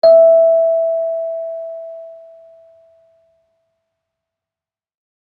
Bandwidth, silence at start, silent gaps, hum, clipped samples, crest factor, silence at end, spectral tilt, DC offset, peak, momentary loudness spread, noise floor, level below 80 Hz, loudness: 4.8 kHz; 0.05 s; none; none; under 0.1%; 14 dB; 3.15 s; -5.5 dB/octave; under 0.1%; -2 dBFS; 24 LU; under -90 dBFS; -74 dBFS; -13 LUFS